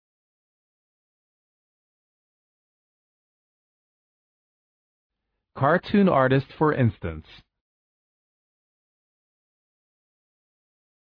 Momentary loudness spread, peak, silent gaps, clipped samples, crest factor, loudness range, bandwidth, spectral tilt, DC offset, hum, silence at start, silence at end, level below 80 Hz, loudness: 16 LU; -6 dBFS; none; under 0.1%; 22 dB; 8 LU; 5.2 kHz; -10.5 dB/octave; under 0.1%; none; 5.55 s; 3.85 s; -56 dBFS; -22 LUFS